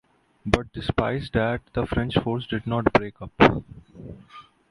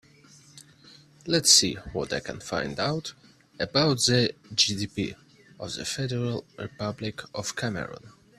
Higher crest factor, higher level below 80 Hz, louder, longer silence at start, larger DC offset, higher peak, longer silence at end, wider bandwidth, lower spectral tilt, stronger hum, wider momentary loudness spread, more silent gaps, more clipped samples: about the same, 24 dB vs 24 dB; first, -40 dBFS vs -56 dBFS; about the same, -24 LUFS vs -26 LUFS; about the same, 0.45 s vs 0.55 s; neither; first, 0 dBFS vs -4 dBFS; about the same, 0.3 s vs 0.3 s; second, 11.5 kHz vs 14 kHz; first, -7 dB/octave vs -3 dB/octave; neither; first, 23 LU vs 17 LU; neither; neither